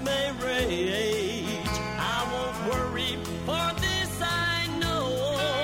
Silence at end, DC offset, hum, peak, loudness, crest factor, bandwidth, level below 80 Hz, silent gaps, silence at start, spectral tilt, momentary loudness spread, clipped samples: 0 s; under 0.1%; none; -14 dBFS; -28 LUFS; 14 dB; 16.5 kHz; -44 dBFS; none; 0 s; -4 dB/octave; 4 LU; under 0.1%